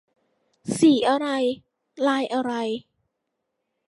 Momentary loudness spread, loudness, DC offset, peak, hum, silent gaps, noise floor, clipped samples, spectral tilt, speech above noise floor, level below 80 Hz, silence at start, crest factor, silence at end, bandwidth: 15 LU; -23 LUFS; under 0.1%; -8 dBFS; none; none; -79 dBFS; under 0.1%; -4.5 dB/octave; 58 dB; -70 dBFS; 0.65 s; 18 dB; 1.05 s; 11.5 kHz